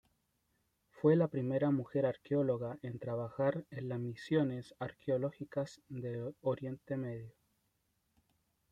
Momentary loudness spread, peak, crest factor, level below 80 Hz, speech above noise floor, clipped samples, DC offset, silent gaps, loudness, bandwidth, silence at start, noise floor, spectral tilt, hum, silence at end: 11 LU; -18 dBFS; 18 dB; -74 dBFS; 44 dB; under 0.1%; under 0.1%; none; -37 LUFS; 9.8 kHz; 0.95 s; -80 dBFS; -9 dB/octave; none; 1.4 s